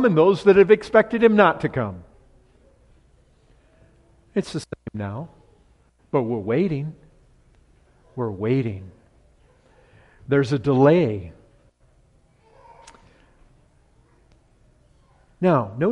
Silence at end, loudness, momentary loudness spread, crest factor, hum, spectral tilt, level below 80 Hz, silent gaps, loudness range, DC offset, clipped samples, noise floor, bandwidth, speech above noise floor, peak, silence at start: 0 s; -20 LUFS; 19 LU; 20 dB; none; -8 dB/octave; -54 dBFS; none; 13 LU; under 0.1%; under 0.1%; -58 dBFS; 11 kHz; 39 dB; -2 dBFS; 0 s